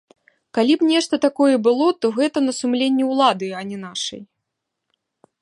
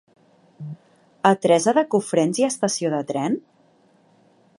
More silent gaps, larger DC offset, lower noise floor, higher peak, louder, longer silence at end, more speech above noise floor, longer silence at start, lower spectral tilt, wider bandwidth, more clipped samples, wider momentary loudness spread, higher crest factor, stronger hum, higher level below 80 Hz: neither; neither; first, -80 dBFS vs -58 dBFS; about the same, -2 dBFS vs -2 dBFS; about the same, -19 LUFS vs -21 LUFS; about the same, 1.2 s vs 1.2 s; first, 61 dB vs 38 dB; about the same, 0.55 s vs 0.6 s; about the same, -4 dB/octave vs -4.5 dB/octave; about the same, 11 kHz vs 11.5 kHz; neither; second, 11 LU vs 20 LU; about the same, 18 dB vs 22 dB; neither; about the same, -72 dBFS vs -74 dBFS